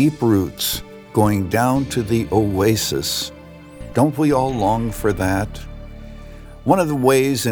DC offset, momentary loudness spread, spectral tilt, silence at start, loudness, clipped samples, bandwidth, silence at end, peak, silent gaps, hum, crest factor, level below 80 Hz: under 0.1%; 20 LU; -5.5 dB/octave; 0 s; -19 LUFS; under 0.1%; over 20 kHz; 0 s; -2 dBFS; none; none; 18 dB; -38 dBFS